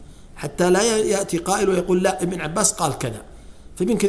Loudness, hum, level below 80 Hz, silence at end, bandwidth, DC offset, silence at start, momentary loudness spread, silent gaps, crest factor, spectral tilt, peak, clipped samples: -20 LUFS; none; -44 dBFS; 0 s; 11 kHz; under 0.1%; 0 s; 12 LU; none; 20 dB; -4 dB/octave; 0 dBFS; under 0.1%